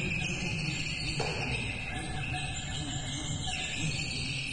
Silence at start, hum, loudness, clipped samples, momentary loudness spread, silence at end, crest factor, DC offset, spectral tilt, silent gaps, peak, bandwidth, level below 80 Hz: 0 s; none; -33 LUFS; under 0.1%; 3 LU; 0 s; 16 dB; under 0.1%; -3.5 dB/octave; none; -18 dBFS; 11 kHz; -46 dBFS